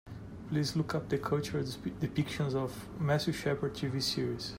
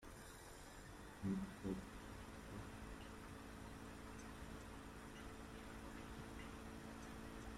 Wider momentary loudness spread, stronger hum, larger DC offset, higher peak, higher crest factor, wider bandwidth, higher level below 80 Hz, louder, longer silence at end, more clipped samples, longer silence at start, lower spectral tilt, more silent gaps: second, 6 LU vs 10 LU; neither; neither; first, -18 dBFS vs -32 dBFS; about the same, 16 dB vs 20 dB; about the same, 16 kHz vs 16 kHz; first, -56 dBFS vs -62 dBFS; first, -34 LUFS vs -53 LUFS; about the same, 0 s vs 0 s; neither; about the same, 0.05 s vs 0 s; about the same, -5.5 dB/octave vs -5.5 dB/octave; neither